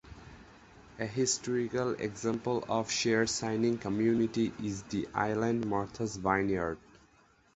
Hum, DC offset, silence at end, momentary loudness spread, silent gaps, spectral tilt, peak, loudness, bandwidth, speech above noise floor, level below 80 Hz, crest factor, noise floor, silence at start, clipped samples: none; under 0.1%; 0.75 s; 8 LU; none; -4.5 dB/octave; -12 dBFS; -32 LUFS; 8.2 kHz; 33 dB; -58 dBFS; 20 dB; -65 dBFS; 0.05 s; under 0.1%